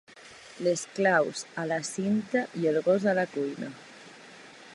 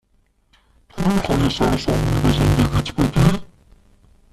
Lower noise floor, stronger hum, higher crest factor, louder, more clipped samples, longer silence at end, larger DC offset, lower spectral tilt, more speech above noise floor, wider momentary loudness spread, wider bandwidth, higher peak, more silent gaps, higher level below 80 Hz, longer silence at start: second, -50 dBFS vs -61 dBFS; neither; about the same, 20 dB vs 16 dB; second, -28 LUFS vs -19 LUFS; neither; second, 0 s vs 0.85 s; neither; second, -5 dB/octave vs -6.5 dB/octave; second, 22 dB vs 44 dB; first, 23 LU vs 5 LU; second, 11.5 kHz vs 14 kHz; second, -10 dBFS vs -2 dBFS; neither; second, -78 dBFS vs -30 dBFS; second, 0.15 s vs 0.95 s